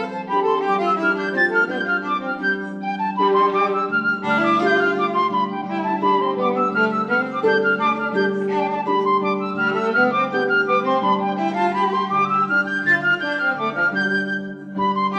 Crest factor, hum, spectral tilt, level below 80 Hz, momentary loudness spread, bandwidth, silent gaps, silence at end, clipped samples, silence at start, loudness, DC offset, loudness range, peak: 14 dB; none; -6.5 dB/octave; -68 dBFS; 5 LU; 8.8 kHz; none; 0 s; under 0.1%; 0 s; -20 LUFS; under 0.1%; 1 LU; -6 dBFS